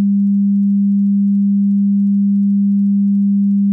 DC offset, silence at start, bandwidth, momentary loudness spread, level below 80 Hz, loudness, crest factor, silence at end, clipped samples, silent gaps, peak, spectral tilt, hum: under 0.1%; 0 s; 0.3 kHz; 0 LU; -72 dBFS; -14 LUFS; 4 dB; 0 s; under 0.1%; none; -10 dBFS; -14.5 dB/octave; none